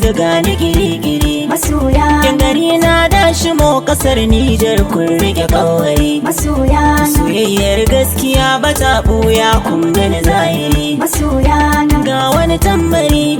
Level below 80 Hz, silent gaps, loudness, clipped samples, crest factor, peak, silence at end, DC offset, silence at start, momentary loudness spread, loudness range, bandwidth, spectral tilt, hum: -18 dBFS; none; -11 LUFS; under 0.1%; 10 dB; 0 dBFS; 0 s; under 0.1%; 0 s; 4 LU; 1 LU; 20 kHz; -5 dB/octave; none